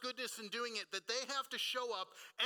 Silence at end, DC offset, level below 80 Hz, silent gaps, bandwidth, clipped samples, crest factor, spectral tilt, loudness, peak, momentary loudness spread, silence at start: 0 s; under 0.1%; under -90 dBFS; none; 19 kHz; under 0.1%; 20 dB; 0 dB/octave; -41 LUFS; -22 dBFS; 5 LU; 0 s